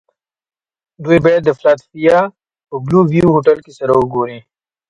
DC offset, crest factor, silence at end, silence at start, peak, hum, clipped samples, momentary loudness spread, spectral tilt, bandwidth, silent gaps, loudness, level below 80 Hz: under 0.1%; 14 dB; 0.5 s; 1 s; 0 dBFS; none; under 0.1%; 12 LU; -8.5 dB/octave; 10.5 kHz; none; -13 LUFS; -46 dBFS